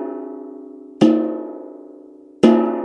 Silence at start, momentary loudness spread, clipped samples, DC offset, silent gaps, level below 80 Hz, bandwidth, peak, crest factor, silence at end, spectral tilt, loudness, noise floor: 0 s; 23 LU; under 0.1%; under 0.1%; none; -64 dBFS; 10 kHz; 0 dBFS; 20 dB; 0 s; -7 dB/octave; -17 LUFS; -43 dBFS